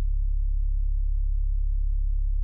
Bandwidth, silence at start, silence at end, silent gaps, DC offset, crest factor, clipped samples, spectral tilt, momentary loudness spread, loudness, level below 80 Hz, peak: 0.2 kHz; 0 s; 0 s; none; under 0.1%; 4 dB; under 0.1%; -25 dB/octave; 0 LU; -30 LUFS; -24 dBFS; -18 dBFS